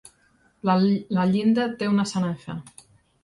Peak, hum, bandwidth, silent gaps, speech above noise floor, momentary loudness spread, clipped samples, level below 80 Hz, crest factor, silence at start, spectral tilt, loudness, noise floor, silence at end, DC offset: -10 dBFS; none; 11.5 kHz; none; 40 dB; 12 LU; under 0.1%; -62 dBFS; 14 dB; 0.65 s; -6.5 dB/octave; -23 LUFS; -62 dBFS; 0.6 s; under 0.1%